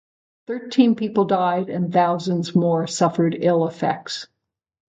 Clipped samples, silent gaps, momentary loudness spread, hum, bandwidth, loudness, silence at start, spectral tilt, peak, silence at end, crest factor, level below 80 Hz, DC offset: under 0.1%; none; 10 LU; none; 9.2 kHz; -20 LUFS; 0.5 s; -6.5 dB/octave; -4 dBFS; 0.7 s; 18 dB; -68 dBFS; under 0.1%